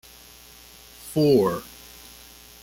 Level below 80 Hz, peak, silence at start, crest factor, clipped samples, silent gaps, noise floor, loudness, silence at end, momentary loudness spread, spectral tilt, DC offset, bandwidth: -56 dBFS; -8 dBFS; 1.05 s; 20 dB; under 0.1%; none; -48 dBFS; -22 LUFS; 1 s; 26 LU; -6.5 dB/octave; under 0.1%; 17 kHz